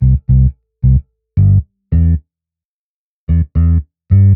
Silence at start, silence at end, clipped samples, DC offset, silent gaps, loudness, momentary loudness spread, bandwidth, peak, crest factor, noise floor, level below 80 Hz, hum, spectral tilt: 0 s; 0 s; under 0.1%; under 0.1%; 2.65-3.27 s; -14 LUFS; 6 LU; 2.3 kHz; 0 dBFS; 12 dB; under -90 dBFS; -18 dBFS; none; -14 dB/octave